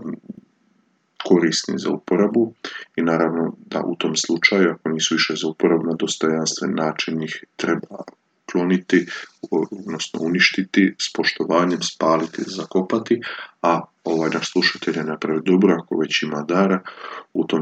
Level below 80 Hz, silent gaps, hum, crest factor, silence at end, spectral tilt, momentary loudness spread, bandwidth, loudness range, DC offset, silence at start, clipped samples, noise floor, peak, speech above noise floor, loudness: -74 dBFS; none; none; 20 dB; 0 s; -4 dB/octave; 11 LU; 9 kHz; 3 LU; under 0.1%; 0 s; under 0.1%; -63 dBFS; 0 dBFS; 43 dB; -20 LUFS